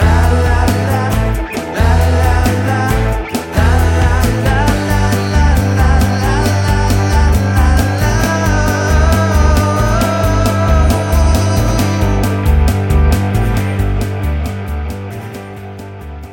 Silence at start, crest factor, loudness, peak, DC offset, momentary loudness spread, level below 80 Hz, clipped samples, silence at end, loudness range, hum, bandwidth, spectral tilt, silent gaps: 0 s; 10 dB; -13 LUFS; -2 dBFS; under 0.1%; 8 LU; -16 dBFS; under 0.1%; 0 s; 3 LU; none; 17 kHz; -6 dB/octave; none